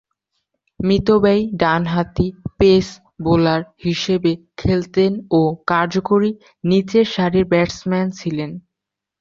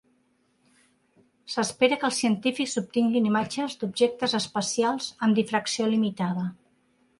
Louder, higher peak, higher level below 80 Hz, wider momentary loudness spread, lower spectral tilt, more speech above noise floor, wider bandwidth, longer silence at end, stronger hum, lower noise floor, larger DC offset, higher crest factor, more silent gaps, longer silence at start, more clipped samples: first, -18 LUFS vs -26 LUFS; first, -2 dBFS vs -8 dBFS; first, -42 dBFS vs -70 dBFS; first, 10 LU vs 7 LU; first, -7 dB/octave vs -4 dB/octave; first, 66 dB vs 43 dB; second, 7.4 kHz vs 11.5 kHz; about the same, 0.6 s vs 0.65 s; neither; first, -83 dBFS vs -68 dBFS; neither; about the same, 16 dB vs 20 dB; neither; second, 0.8 s vs 1.45 s; neither